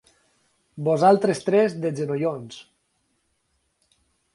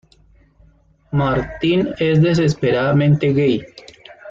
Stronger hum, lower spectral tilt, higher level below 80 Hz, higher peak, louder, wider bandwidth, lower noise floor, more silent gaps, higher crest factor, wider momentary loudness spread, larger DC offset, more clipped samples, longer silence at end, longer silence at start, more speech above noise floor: neither; about the same, -6.5 dB/octave vs -7.5 dB/octave; second, -70 dBFS vs -44 dBFS; about the same, -6 dBFS vs -4 dBFS; second, -22 LUFS vs -17 LUFS; first, 11.5 kHz vs 7.4 kHz; first, -71 dBFS vs -53 dBFS; neither; first, 20 dB vs 14 dB; first, 18 LU vs 5 LU; neither; neither; first, 1.7 s vs 0 s; second, 0.75 s vs 1.1 s; first, 50 dB vs 37 dB